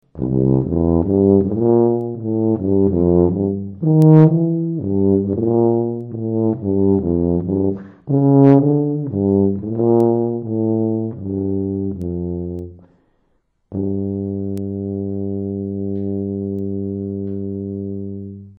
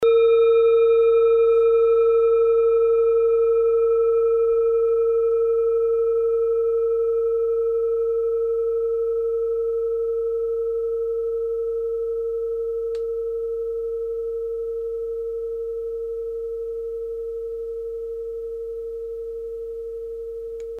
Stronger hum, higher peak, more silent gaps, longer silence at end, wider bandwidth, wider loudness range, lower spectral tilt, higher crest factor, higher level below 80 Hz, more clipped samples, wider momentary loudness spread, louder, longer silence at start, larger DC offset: neither; first, 0 dBFS vs -10 dBFS; neither; about the same, 0.05 s vs 0 s; second, 2.8 kHz vs 3.9 kHz; about the same, 10 LU vs 12 LU; first, -12.5 dB/octave vs -5.5 dB/octave; first, 18 dB vs 12 dB; first, -42 dBFS vs -52 dBFS; neither; second, 11 LU vs 14 LU; first, -18 LUFS vs -22 LUFS; first, 0.15 s vs 0 s; neither